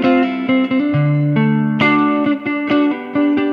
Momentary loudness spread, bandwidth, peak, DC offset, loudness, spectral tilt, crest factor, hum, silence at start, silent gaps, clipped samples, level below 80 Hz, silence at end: 4 LU; 5.4 kHz; -2 dBFS; under 0.1%; -15 LUFS; -9 dB/octave; 14 dB; none; 0 s; none; under 0.1%; -56 dBFS; 0 s